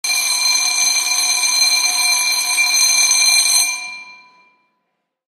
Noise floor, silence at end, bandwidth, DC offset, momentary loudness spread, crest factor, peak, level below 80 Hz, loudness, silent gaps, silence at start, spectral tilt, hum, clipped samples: -72 dBFS; 1.15 s; 15 kHz; under 0.1%; 5 LU; 16 dB; -2 dBFS; -74 dBFS; -12 LUFS; none; 0.05 s; 5 dB/octave; none; under 0.1%